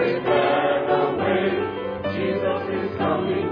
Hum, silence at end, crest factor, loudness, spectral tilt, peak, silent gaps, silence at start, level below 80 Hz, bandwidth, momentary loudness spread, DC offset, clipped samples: none; 0 s; 14 dB; -22 LUFS; -8.5 dB/octave; -8 dBFS; none; 0 s; -56 dBFS; 5.2 kHz; 7 LU; under 0.1%; under 0.1%